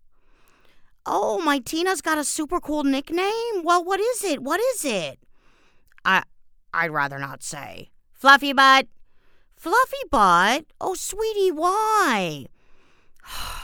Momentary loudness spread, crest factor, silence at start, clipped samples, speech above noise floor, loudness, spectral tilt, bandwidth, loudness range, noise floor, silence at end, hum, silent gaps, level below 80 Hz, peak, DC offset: 18 LU; 22 dB; 1.05 s; under 0.1%; 33 dB; -21 LUFS; -2.5 dB/octave; over 20 kHz; 6 LU; -55 dBFS; 0 s; none; none; -50 dBFS; 0 dBFS; under 0.1%